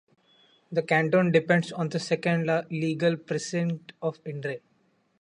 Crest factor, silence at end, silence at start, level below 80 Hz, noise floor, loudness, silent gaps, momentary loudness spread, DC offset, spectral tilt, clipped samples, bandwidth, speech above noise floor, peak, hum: 20 dB; 0.65 s; 0.7 s; -70 dBFS; -68 dBFS; -27 LUFS; none; 12 LU; under 0.1%; -6 dB/octave; under 0.1%; 10.5 kHz; 42 dB; -8 dBFS; none